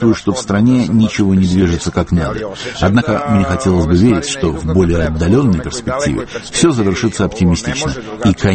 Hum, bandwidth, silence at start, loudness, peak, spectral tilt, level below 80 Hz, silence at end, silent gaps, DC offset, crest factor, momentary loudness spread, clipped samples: none; 8.8 kHz; 0 s; -14 LUFS; 0 dBFS; -6 dB/octave; -30 dBFS; 0 s; none; under 0.1%; 14 dB; 6 LU; under 0.1%